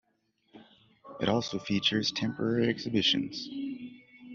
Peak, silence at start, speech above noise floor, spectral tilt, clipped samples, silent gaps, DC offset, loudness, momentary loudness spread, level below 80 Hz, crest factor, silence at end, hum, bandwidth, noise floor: -12 dBFS; 0.55 s; 45 dB; -3.5 dB/octave; under 0.1%; none; under 0.1%; -30 LUFS; 13 LU; -66 dBFS; 20 dB; 0 s; none; 7.4 kHz; -74 dBFS